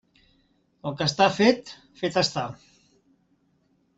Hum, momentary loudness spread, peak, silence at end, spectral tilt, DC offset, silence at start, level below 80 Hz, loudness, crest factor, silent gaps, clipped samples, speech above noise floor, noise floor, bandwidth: none; 17 LU; -4 dBFS; 1.4 s; -4.5 dB/octave; under 0.1%; 0.85 s; -64 dBFS; -24 LUFS; 22 dB; none; under 0.1%; 43 dB; -67 dBFS; 8.2 kHz